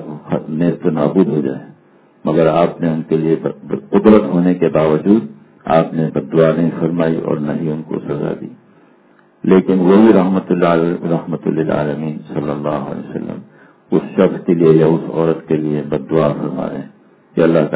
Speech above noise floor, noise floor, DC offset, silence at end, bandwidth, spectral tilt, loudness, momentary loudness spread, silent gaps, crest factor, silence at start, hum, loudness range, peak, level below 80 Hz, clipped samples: 36 dB; -50 dBFS; under 0.1%; 0 s; 4 kHz; -12.5 dB/octave; -15 LUFS; 13 LU; none; 14 dB; 0 s; none; 4 LU; 0 dBFS; -50 dBFS; 0.1%